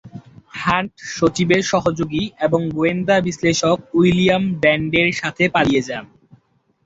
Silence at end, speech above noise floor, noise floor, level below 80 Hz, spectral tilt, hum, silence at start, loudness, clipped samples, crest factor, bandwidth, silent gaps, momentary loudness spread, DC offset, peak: 0.8 s; 43 dB; -60 dBFS; -48 dBFS; -5 dB/octave; none; 0.05 s; -18 LUFS; under 0.1%; 16 dB; 8 kHz; none; 7 LU; under 0.1%; -2 dBFS